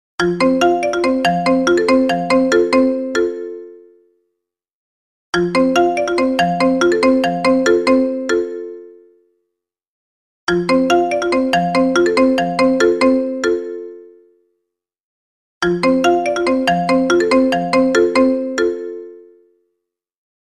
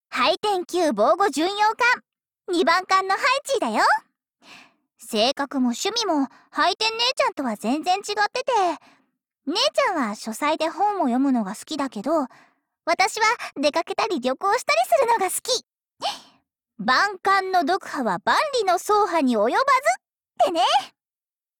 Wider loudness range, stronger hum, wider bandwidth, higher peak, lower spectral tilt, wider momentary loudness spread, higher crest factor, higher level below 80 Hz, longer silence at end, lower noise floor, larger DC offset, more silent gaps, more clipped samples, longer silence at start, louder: about the same, 5 LU vs 3 LU; neither; second, 12 kHz vs 19 kHz; first, 0 dBFS vs -8 dBFS; first, -5 dB/octave vs -2.5 dB/octave; about the same, 8 LU vs 8 LU; about the same, 16 dB vs 14 dB; first, -50 dBFS vs -66 dBFS; first, 1.2 s vs 0.7 s; second, -78 dBFS vs under -90 dBFS; neither; first, 4.73-5.33 s, 9.87-10.47 s, 15.00-15.61 s vs none; neither; about the same, 0.2 s vs 0.1 s; first, -15 LUFS vs -22 LUFS